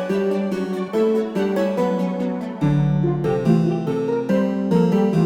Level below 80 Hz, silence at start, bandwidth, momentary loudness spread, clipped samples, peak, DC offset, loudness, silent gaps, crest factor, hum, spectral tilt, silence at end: -48 dBFS; 0 s; 13.5 kHz; 5 LU; under 0.1%; -6 dBFS; under 0.1%; -20 LUFS; none; 14 dB; none; -8.5 dB/octave; 0 s